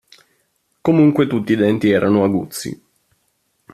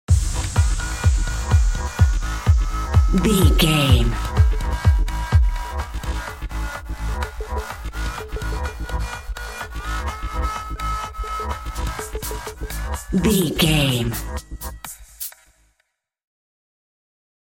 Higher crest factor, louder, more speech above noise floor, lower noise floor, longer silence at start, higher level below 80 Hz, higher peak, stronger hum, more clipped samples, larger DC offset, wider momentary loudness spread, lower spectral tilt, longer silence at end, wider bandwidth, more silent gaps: about the same, 16 dB vs 18 dB; first, -16 LUFS vs -22 LUFS; about the same, 51 dB vs 54 dB; second, -66 dBFS vs -71 dBFS; first, 0.85 s vs 0.1 s; second, -56 dBFS vs -24 dBFS; about the same, -2 dBFS vs -2 dBFS; neither; neither; neither; about the same, 14 LU vs 14 LU; first, -7 dB/octave vs -5 dB/octave; second, 1 s vs 2.25 s; second, 14 kHz vs 17 kHz; neither